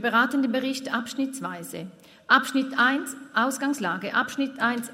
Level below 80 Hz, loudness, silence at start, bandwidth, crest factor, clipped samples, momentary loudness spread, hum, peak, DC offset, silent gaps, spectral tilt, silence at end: -76 dBFS; -25 LUFS; 0 s; 16 kHz; 22 dB; under 0.1%; 13 LU; none; -4 dBFS; under 0.1%; none; -3 dB/octave; 0 s